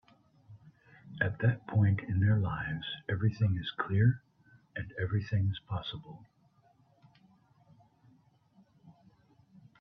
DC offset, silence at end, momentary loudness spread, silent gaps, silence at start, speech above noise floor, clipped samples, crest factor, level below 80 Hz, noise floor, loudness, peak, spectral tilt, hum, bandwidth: under 0.1%; 0.9 s; 15 LU; none; 0.5 s; 36 dB; under 0.1%; 20 dB; -60 dBFS; -67 dBFS; -32 LUFS; -14 dBFS; -8.5 dB/octave; none; 5.2 kHz